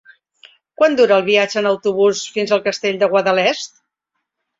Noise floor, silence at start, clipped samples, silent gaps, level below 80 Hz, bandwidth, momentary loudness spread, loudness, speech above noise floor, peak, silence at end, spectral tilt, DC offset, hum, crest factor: -76 dBFS; 0.8 s; under 0.1%; none; -66 dBFS; 7.8 kHz; 7 LU; -16 LUFS; 61 dB; -2 dBFS; 0.9 s; -3.5 dB/octave; under 0.1%; none; 16 dB